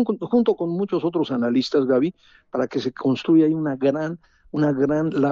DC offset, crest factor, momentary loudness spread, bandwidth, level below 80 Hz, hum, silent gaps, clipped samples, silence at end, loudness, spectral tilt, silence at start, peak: under 0.1%; 14 dB; 9 LU; 7.2 kHz; -60 dBFS; none; none; under 0.1%; 0 s; -22 LUFS; -6.5 dB/octave; 0 s; -8 dBFS